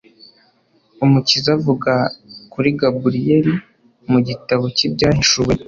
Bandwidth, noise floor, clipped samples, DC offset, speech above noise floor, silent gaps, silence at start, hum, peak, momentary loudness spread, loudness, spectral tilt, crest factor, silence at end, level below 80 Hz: 7.6 kHz; -58 dBFS; under 0.1%; under 0.1%; 42 dB; none; 1 s; none; -2 dBFS; 6 LU; -16 LUFS; -5 dB/octave; 16 dB; 0.05 s; -44 dBFS